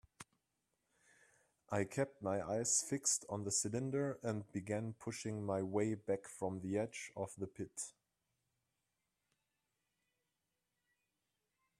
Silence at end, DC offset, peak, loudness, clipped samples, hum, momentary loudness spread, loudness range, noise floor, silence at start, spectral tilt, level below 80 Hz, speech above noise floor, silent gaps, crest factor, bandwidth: 3.9 s; under 0.1%; -22 dBFS; -40 LUFS; under 0.1%; none; 11 LU; 13 LU; -89 dBFS; 0.2 s; -4 dB/octave; -78 dBFS; 48 dB; none; 22 dB; 14 kHz